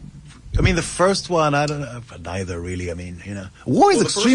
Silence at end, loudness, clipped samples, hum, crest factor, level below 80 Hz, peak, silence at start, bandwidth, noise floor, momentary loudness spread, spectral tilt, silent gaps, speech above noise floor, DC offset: 0 s; -20 LUFS; under 0.1%; none; 16 dB; -34 dBFS; -4 dBFS; 0 s; 11.5 kHz; -40 dBFS; 17 LU; -5 dB/octave; none; 20 dB; under 0.1%